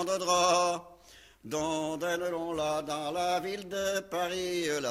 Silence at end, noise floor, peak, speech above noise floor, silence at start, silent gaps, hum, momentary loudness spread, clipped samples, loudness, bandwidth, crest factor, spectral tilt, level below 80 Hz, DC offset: 0 s; -57 dBFS; -14 dBFS; 26 dB; 0 s; none; none; 9 LU; under 0.1%; -31 LUFS; 16 kHz; 18 dB; -3 dB/octave; -62 dBFS; under 0.1%